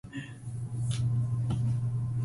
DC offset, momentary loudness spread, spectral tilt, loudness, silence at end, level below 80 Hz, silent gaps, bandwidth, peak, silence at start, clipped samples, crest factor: under 0.1%; 11 LU; -7 dB/octave; -32 LUFS; 0 s; -50 dBFS; none; 11.5 kHz; -20 dBFS; 0.05 s; under 0.1%; 10 dB